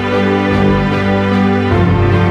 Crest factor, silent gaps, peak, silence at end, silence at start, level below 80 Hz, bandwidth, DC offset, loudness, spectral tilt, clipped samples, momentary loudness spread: 10 dB; none; 0 dBFS; 0 s; 0 s; -30 dBFS; 7.8 kHz; under 0.1%; -12 LUFS; -8 dB/octave; under 0.1%; 2 LU